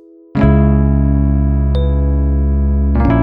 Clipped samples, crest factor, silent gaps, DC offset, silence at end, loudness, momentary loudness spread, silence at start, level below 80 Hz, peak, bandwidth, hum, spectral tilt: under 0.1%; 12 dB; none; under 0.1%; 0 s; -14 LUFS; 4 LU; 0.35 s; -14 dBFS; 0 dBFS; 3.9 kHz; none; -11.5 dB/octave